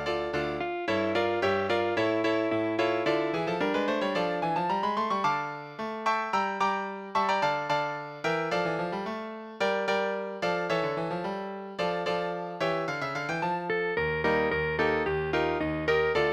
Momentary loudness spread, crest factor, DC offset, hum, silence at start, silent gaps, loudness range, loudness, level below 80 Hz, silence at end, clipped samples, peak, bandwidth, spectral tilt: 6 LU; 16 dB; under 0.1%; none; 0 s; none; 3 LU; -29 LUFS; -54 dBFS; 0 s; under 0.1%; -14 dBFS; 12.5 kHz; -5.5 dB/octave